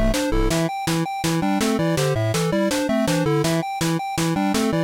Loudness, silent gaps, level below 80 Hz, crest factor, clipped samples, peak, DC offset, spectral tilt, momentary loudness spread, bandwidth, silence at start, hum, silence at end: -21 LUFS; none; -32 dBFS; 10 dB; under 0.1%; -10 dBFS; under 0.1%; -5 dB/octave; 3 LU; 17 kHz; 0 s; none; 0 s